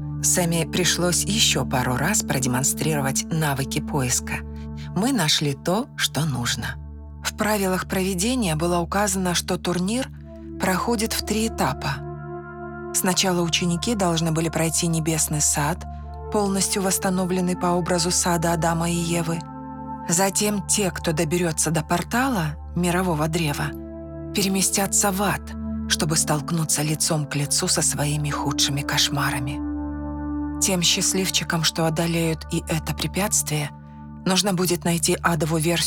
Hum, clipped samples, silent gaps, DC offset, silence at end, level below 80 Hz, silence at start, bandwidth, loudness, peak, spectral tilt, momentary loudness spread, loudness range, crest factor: none; under 0.1%; none; under 0.1%; 0 s; -42 dBFS; 0 s; over 20 kHz; -22 LUFS; -4 dBFS; -3.5 dB/octave; 11 LU; 2 LU; 18 dB